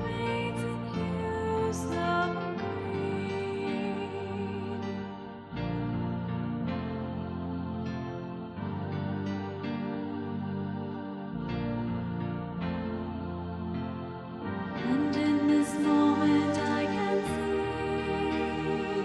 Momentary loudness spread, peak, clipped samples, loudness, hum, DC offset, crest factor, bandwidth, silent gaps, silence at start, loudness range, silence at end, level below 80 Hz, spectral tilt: 10 LU; -14 dBFS; under 0.1%; -32 LUFS; none; under 0.1%; 16 dB; 11.5 kHz; none; 0 s; 8 LU; 0 s; -52 dBFS; -7 dB/octave